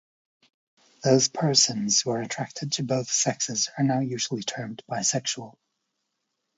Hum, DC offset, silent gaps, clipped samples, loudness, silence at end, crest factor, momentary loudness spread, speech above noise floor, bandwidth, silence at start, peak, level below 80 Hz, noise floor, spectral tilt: none; under 0.1%; none; under 0.1%; -24 LUFS; 1.1 s; 22 dB; 11 LU; 54 dB; 8 kHz; 1 s; -6 dBFS; -72 dBFS; -79 dBFS; -3 dB/octave